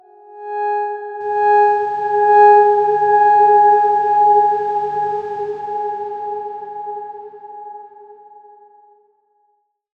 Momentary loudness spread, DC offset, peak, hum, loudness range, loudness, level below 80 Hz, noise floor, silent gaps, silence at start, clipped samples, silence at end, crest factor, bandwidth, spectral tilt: 21 LU; under 0.1%; -2 dBFS; none; 19 LU; -14 LUFS; -66 dBFS; -65 dBFS; none; 0.3 s; under 0.1%; 1.85 s; 16 dB; 5 kHz; -6 dB/octave